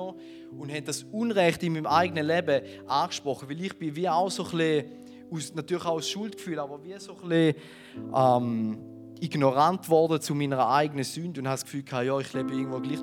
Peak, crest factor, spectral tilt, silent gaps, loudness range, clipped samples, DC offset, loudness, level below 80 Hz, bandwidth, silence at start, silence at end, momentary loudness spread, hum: -8 dBFS; 20 dB; -5.5 dB/octave; none; 4 LU; under 0.1%; under 0.1%; -27 LUFS; -72 dBFS; 18.5 kHz; 0 s; 0 s; 16 LU; none